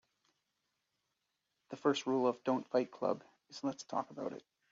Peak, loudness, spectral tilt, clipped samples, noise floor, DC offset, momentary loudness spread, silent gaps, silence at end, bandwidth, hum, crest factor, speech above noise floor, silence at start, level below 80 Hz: -18 dBFS; -37 LUFS; -4 dB/octave; under 0.1%; -85 dBFS; under 0.1%; 12 LU; none; 0.3 s; 7.4 kHz; none; 20 dB; 49 dB; 1.7 s; -86 dBFS